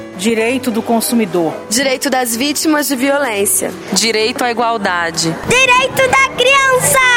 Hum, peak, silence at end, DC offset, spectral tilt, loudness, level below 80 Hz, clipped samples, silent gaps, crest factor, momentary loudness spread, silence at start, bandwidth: none; 0 dBFS; 0 s; under 0.1%; -2.5 dB/octave; -13 LUFS; -44 dBFS; under 0.1%; none; 14 dB; 6 LU; 0 s; 16.5 kHz